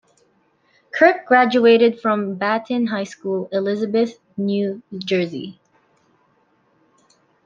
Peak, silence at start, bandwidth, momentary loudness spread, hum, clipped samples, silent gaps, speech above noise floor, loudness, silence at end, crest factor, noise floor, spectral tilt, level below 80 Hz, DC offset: -2 dBFS; 0.95 s; 7.4 kHz; 13 LU; none; under 0.1%; none; 43 dB; -19 LUFS; 1.95 s; 18 dB; -61 dBFS; -6 dB/octave; -70 dBFS; under 0.1%